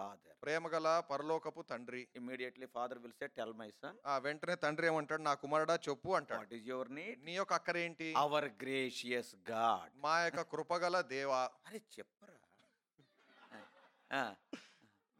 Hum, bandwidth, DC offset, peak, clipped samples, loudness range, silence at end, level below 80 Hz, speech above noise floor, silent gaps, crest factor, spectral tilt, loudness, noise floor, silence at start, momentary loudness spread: none; 16 kHz; under 0.1%; -20 dBFS; under 0.1%; 7 LU; 0.55 s; -88 dBFS; 36 dB; none; 20 dB; -4 dB/octave; -39 LUFS; -76 dBFS; 0 s; 15 LU